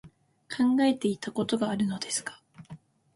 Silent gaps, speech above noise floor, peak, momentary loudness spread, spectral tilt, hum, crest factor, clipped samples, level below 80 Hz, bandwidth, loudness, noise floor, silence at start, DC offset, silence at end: none; 23 dB; -14 dBFS; 23 LU; -4.5 dB/octave; none; 16 dB; under 0.1%; -68 dBFS; 11.5 kHz; -28 LUFS; -50 dBFS; 0.05 s; under 0.1%; 0.4 s